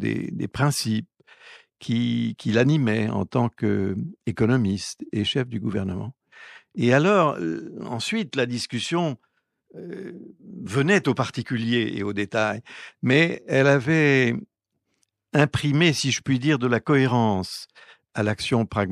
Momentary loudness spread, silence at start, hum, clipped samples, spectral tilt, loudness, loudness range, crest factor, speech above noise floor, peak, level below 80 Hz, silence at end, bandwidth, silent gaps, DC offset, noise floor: 16 LU; 0 s; none; under 0.1%; -5.5 dB/octave; -23 LUFS; 4 LU; 18 dB; 53 dB; -4 dBFS; -58 dBFS; 0 s; 13 kHz; none; under 0.1%; -76 dBFS